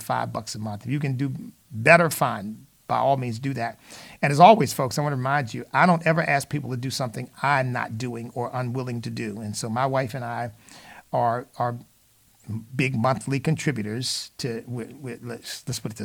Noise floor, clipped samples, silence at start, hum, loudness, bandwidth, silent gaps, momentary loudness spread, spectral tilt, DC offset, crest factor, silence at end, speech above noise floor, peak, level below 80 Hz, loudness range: -59 dBFS; under 0.1%; 0 s; none; -24 LUFS; 19 kHz; none; 16 LU; -5.5 dB/octave; under 0.1%; 24 dB; 0 s; 35 dB; -2 dBFS; -62 dBFS; 8 LU